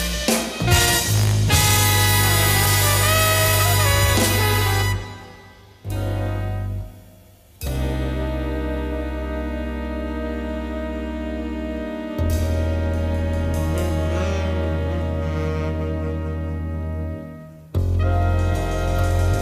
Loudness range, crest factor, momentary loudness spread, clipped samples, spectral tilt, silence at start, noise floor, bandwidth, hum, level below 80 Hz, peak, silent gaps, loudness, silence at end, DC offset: 11 LU; 18 dB; 12 LU; under 0.1%; -4 dB/octave; 0 s; -48 dBFS; 16 kHz; none; -28 dBFS; -4 dBFS; none; -21 LUFS; 0 s; under 0.1%